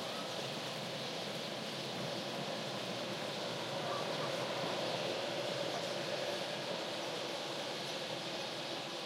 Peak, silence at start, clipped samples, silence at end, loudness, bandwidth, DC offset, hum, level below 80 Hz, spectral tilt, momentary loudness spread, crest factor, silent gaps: -24 dBFS; 0 s; under 0.1%; 0 s; -39 LUFS; 16 kHz; under 0.1%; none; -82 dBFS; -3.5 dB/octave; 3 LU; 16 dB; none